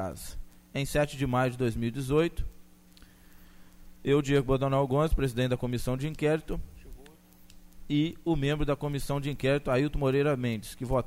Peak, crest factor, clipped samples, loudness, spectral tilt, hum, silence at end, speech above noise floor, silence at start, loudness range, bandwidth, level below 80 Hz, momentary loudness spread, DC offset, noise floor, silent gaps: -12 dBFS; 16 dB; under 0.1%; -29 LUFS; -6.5 dB/octave; none; 0 s; 27 dB; 0 s; 3 LU; 16 kHz; -42 dBFS; 12 LU; under 0.1%; -55 dBFS; none